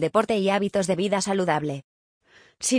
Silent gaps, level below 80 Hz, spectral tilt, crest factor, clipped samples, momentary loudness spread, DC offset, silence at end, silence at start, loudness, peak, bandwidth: 1.84-2.21 s; -64 dBFS; -4.5 dB/octave; 18 dB; under 0.1%; 7 LU; under 0.1%; 0 s; 0 s; -24 LUFS; -6 dBFS; 10.5 kHz